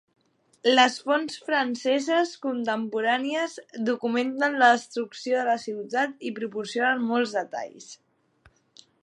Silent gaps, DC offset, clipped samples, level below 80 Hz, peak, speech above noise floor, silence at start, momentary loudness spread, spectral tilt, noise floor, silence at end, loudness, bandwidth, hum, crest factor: none; under 0.1%; under 0.1%; -78 dBFS; -6 dBFS; 37 dB; 0.65 s; 12 LU; -3 dB/octave; -62 dBFS; 1.1 s; -25 LUFS; 11.5 kHz; none; 20 dB